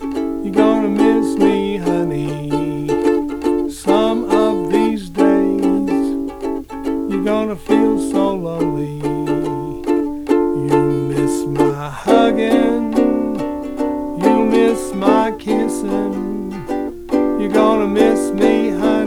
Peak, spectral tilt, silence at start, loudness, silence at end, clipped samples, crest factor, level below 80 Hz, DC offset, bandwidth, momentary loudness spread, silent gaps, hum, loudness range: 0 dBFS; -6.5 dB/octave; 0 s; -17 LUFS; 0 s; under 0.1%; 16 dB; -40 dBFS; under 0.1%; 15 kHz; 8 LU; none; none; 2 LU